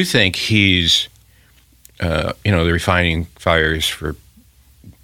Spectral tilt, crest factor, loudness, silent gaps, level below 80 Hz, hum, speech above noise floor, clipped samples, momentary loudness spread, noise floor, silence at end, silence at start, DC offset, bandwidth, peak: -4 dB/octave; 18 dB; -16 LUFS; none; -38 dBFS; none; 35 dB; under 0.1%; 13 LU; -51 dBFS; 0.15 s; 0 s; under 0.1%; 16.5 kHz; 0 dBFS